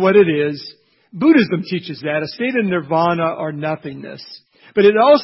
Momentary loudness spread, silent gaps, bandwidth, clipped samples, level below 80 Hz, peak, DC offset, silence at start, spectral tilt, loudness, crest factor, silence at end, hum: 20 LU; none; 5.8 kHz; under 0.1%; -60 dBFS; -2 dBFS; under 0.1%; 0 s; -10.5 dB/octave; -17 LUFS; 16 dB; 0 s; none